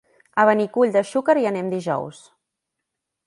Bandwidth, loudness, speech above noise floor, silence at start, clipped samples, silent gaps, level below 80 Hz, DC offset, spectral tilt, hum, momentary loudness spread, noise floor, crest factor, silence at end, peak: 11.5 kHz; -20 LUFS; 62 dB; 0.35 s; under 0.1%; none; -72 dBFS; under 0.1%; -6 dB/octave; none; 10 LU; -81 dBFS; 20 dB; 1.15 s; -2 dBFS